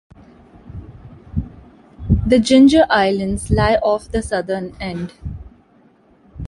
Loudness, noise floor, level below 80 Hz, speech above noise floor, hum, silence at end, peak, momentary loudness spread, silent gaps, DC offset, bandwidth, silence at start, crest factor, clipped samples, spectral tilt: -16 LUFS; -52 dBFS; -32 dBFS; 37 dB; none; 0 s; -2 dBFS; 26 LU; none; under 0.1%; 11.5 kHz; 0.65 s; 16 dB; under 0.1%; -6 dB/octave